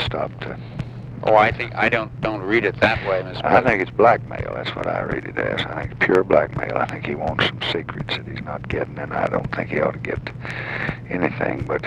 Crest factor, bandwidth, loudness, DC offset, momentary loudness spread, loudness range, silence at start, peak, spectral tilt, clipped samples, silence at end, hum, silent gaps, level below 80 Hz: 20 dB; 10 kHz; -21 LUFS; under 0.1%; 12 LU; 6 LU; 0 s; 0 dBFS; -7 dB/octave; under 0.1%; 0 s; none; none; -42 dBFS